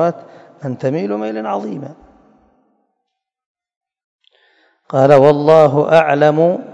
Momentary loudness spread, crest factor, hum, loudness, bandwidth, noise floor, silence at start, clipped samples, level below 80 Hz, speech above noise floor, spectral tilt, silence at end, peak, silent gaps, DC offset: 19 LU; 16 dB; none; -13 LUFS; 9 kHz; -76 dBFS; 0 s; 0.5%; -58 dBFS; 63 dB; -7.5 dB/octave; 0 s; 0 dBFS; 3.46-3.55 s, 3.76-3.81 s, 4.04-4.19 s; under 0.1%